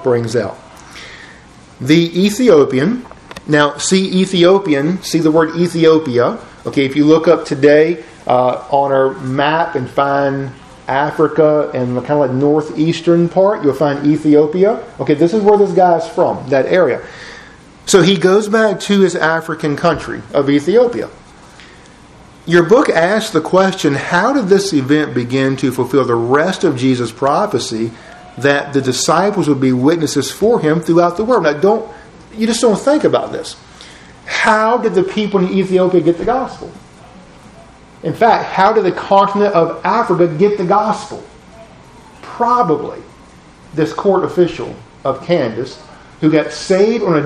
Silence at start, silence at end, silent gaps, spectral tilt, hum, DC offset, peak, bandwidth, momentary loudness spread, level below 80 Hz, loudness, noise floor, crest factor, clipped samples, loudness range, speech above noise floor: 0 s; 0 s; none; -5.5 dB/octave; none; under 0.1%; 0 dBFS; 13.5 kHz; 13 LU; -48 dBFS; -13 LUFS; -41 dBFS; 14 dB; under 0.1%; 4 LU; 28 dB